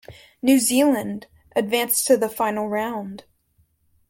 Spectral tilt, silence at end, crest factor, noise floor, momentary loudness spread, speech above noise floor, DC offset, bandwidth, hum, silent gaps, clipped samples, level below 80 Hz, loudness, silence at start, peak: -3 dB/octave; 0.9 s; 18 dB; -64 dBFS; 15 LU; 43 dB; under 0.1%; 17 kHz; none; none; under 0.1%; -62 dBFS; -21 LUFS; 0.1 s; -4 dBFS